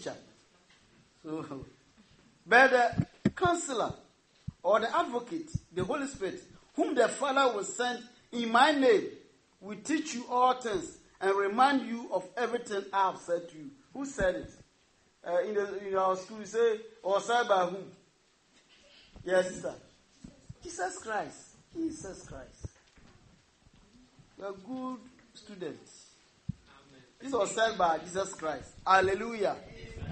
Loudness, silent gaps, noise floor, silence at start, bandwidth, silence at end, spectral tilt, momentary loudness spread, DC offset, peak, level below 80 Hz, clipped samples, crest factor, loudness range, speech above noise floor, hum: -30 LUFS; none; -68 dBFS; 0 s; 8.8 kHz; 0 s; -4 dB/octave; 21 LU; under 0.1%; -8 dBFS; -60 dBFS; under 0.1%; 24 dB; 16 LU; 37 dB; none